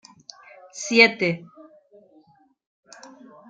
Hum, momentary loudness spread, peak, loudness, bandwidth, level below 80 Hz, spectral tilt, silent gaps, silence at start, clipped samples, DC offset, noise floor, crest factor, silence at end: none; 26 LU; -2 dBFS; -19 LUFS; 9.4 kHz; -76 dBFS; -3.5 dB/octave; none; 0.75 s; under 0.1%; under 0.1%; -58 dBFS; 24 dB; 2.1 s